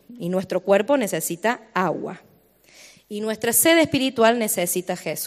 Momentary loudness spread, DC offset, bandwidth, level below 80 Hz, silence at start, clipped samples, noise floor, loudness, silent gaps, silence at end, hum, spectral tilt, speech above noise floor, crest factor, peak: 12 LU; under 0.1%; 15.5 kHz; -64 dBFS; 0.1 s; under 0.1%; -55 dBFS; -21 LUFS; none; 0 s; none; -3.5 dB/octave; 33 dB; 18 dB; -4 dBFS